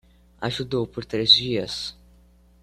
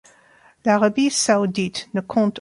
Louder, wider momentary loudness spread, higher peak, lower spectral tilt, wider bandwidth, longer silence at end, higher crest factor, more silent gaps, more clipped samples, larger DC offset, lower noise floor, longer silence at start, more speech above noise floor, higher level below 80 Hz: about the same, -22 LUFS vs -20 LUFS; first, 15 LU vs 8 LU; about the same, -2 dBFS vs -4 dBFS; about the same, -4.5 dB/octave vs -4 dB/octave; first, 14 kHz vs 11.5 kHz; first, 0.7 s vs 0 s; first, 24 dB vs 16 dB; neither; neither; neither; about the same, -55 dBFS vs -54 dBFS; second, 0.4 s vs 0.65 s; about the same, 31 dB vs 34 dB; first, -52 dBFS vs -62 dBFS